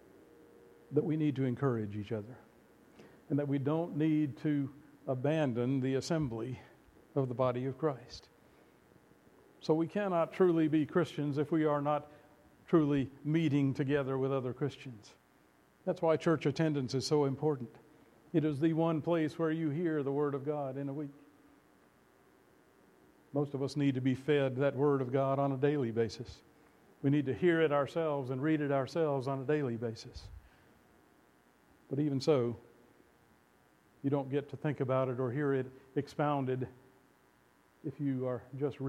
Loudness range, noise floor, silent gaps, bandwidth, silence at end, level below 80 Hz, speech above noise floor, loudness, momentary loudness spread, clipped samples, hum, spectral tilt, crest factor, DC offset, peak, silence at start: 6 LU; -67 dBFS; none; 12 kHz; 0 s; -68 dBFS; 35 dB; -33 LUFS; 11 LU; under 0.1%; none; -7.5 dB/octave; 20 dB; under 0.1%; -14 dBFS; 0.9 s